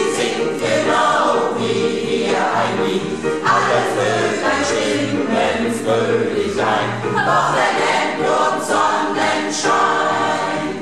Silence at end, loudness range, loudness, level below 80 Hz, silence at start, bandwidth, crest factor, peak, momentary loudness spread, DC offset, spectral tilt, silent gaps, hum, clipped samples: 0 s; 1 LU; -17 LUFS; -54 dBFS; 0 s; 13.5 kHz; 14 dB; -4 dBFS; 4 LU; 0.6%; -4 dB/octave; none; none; under 0.1%